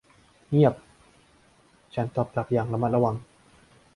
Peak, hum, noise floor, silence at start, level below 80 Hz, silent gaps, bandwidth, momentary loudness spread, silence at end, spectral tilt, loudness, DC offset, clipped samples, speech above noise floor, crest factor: -6 dBFS; none; -60 dBFS; 0.5 s; -58 dBFS; none; 11 kHz; 14 LU; 0.7 s; -9.5 dB/octave; -26 LUFS; under 0.1%; under 0.1%; 36 dB; 22 dB